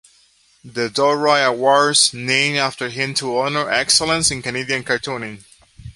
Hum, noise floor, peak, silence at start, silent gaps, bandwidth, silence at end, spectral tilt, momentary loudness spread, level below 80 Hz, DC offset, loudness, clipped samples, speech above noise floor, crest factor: none; -56 dBFS; 0 dBFS; 0.65 s; none; 12 kHz; 0.05 s; -2 dB/octave; 10 LU; -52 dBFS; under 0.1%; -17 LUFS; under 0.1%; 37 dB; 20 dB